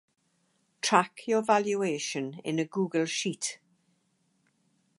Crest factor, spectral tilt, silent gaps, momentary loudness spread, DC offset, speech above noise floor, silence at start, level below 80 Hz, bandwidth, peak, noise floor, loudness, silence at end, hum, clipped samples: 26 dB; -3.5 dB/octave; none; 8 LU; under 0.1%; 44 dB; 0.85 s; -84 dBFS; 11.5 kHz; -6 dBFS; -73 dBFS; -29 LUFS; 1.45 s; none; under 0.1%